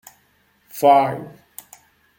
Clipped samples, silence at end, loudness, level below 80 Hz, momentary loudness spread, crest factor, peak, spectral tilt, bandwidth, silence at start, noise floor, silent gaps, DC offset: under 0.1%; 0.9 s; -17 LUFS; -68 dBFS; 26 LU; 18 dB; -4 dBFS; -5.5 dB/octave; 17 kHz; 0.75 s; -61 dBFS; none; under 0.1%